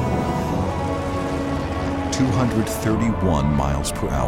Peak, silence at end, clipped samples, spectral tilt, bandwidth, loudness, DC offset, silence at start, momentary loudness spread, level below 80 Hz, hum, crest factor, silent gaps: -6 dBFS; 0 s; under 0.1%; -6 dB/octave; 16.5 kHz; -22 LUFS; under 0.1%; 0 s; 5 LU; -32 dBFS; none; 14 dB; none